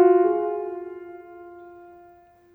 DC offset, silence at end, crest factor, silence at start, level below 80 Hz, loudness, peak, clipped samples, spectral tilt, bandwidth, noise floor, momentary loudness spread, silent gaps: under 0.1%; 0.85 s; 18 dB; 0 s; -70 dBFS; -23 LUFS; -6 dBFS; under 0.1%; -9 dB/octave; 3 kHz; -53 dBFS; 26 LU; none